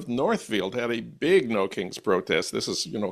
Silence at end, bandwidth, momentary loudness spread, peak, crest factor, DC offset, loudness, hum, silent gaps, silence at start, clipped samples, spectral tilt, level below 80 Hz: 0 s; 13.5 kHz; 7 LU; -10 dBFS; 16 dB; under 0.1%; -26 LUFS; none; none; 0 s; under 0.1%; -4 dB/octave; -62 dBFS